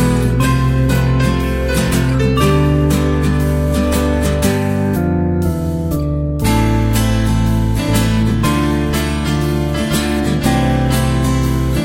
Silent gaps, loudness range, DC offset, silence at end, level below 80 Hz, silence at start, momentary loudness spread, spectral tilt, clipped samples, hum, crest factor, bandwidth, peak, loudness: none; 2 LU; under 0.1%; 0 s; -22 dBFS; 0 s; 3 LU; -6 dB/octave; under 0.1%; none; 14 dB; 16.5 kHz; 0 dBFS; -15 LUFS